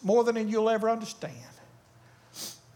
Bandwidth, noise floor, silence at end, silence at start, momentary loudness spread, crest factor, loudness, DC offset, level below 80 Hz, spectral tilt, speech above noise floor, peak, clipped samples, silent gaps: 19 kHz; -57 dBFS; 0.2 s; 0 s; 19 LU; 16 dB; -28 LUFS; under 0.1%; -74 dBFS; -5 dB/octave; 30 dB; -12 dBFS; under 0.1%; none